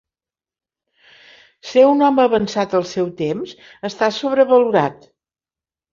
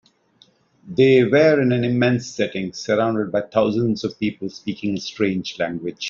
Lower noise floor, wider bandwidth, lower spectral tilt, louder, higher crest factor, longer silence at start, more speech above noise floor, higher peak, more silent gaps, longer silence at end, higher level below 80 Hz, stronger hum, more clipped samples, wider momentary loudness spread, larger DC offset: first, under -90 dBFS vs -57 dBFS; about the same, 7.4 kHz vs 7.4 kHz; about the same, -5.5 dB/octave vs -5.5 dB/octave; first, -17 LUFS vs -20 LUFS; about the same, 16 dB vs 16 dB; first, 1.65 s vs 0.85 s; first, over 74 dB vs 38 dB; about the same, -2 dBFS vs -4 dBFS; neither; first, 1 s vs 0 s; about the same, -60 dBFS vs -58 dBFS; neither; neither; first, 15 LU vs 11 LU; neither